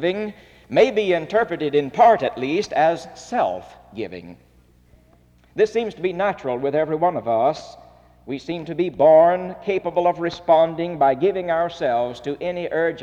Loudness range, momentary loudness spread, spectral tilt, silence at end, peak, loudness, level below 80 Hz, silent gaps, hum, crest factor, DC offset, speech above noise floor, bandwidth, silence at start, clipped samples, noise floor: 7 LU; 16 LU; -6 dB/octave; 0 s; -4 dBFS; -20 LUFS; -56 dBFS; none; none; 16 dB; under 0.1%; 34 dB; 8.4 kHz; 0 s; under 0.1%; -54 dBFS